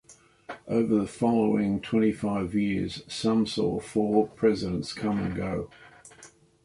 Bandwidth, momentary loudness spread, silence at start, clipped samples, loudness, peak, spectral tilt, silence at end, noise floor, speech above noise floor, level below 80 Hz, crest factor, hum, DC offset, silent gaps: 11.5 kHz; 8 LU; 0.1 s; under 0.1%; -27 LUFS; -10 dBFS; -6.5 dB/octave; 0.35 s; -54 dBFS; 28 dB; -54 dBFS; 18 dB; none; under 0.1%; none